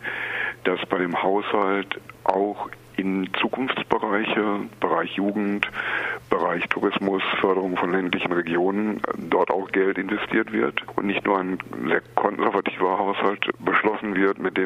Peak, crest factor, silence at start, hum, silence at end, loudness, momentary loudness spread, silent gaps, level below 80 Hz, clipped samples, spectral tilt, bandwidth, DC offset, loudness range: 0 dBFS; 22 dB; 0 s; none; 0 s; -24 LUFS; 5 LU; none; -60 dBFS; under 0.1%; -6.5 dB/octave; 13.5 kHz; under 0.1%; 2 LU